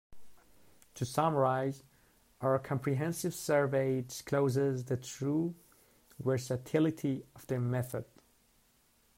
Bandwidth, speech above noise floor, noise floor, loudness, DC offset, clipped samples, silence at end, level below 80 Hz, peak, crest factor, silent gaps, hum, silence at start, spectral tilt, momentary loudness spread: 16 kHz; 37 dB; -69 dBFS; -33 LUFS; under 0.1%; under 0.1%; 1.15 s; -68 dBFS; -16 dBFS; 18 dB; none; none; 0.1 s; -6.5 dB/octave; 10 LU